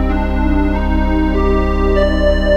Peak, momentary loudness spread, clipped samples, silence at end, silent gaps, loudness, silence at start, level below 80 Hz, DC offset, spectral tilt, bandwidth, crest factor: 0 dBFS; 3 LU; under 0.1%; 0 s; none; -15 LUFS; 0 s; -16 dBFS; 1%; -8 dB/octave; 6.8 kHz; 12 dB